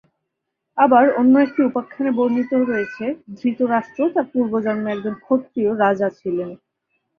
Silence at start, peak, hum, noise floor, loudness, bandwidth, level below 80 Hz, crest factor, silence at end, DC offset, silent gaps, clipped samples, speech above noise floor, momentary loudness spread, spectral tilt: 0.75 s; -2 dBFS; none; -78 dBFS; -19 LUFS; 5.2 kHz; -64 dBFS; 18 dB; 0.65 s; under 0.1%; none; under 0.1%; 60 dB; 12 LU; -8.5 dB/octave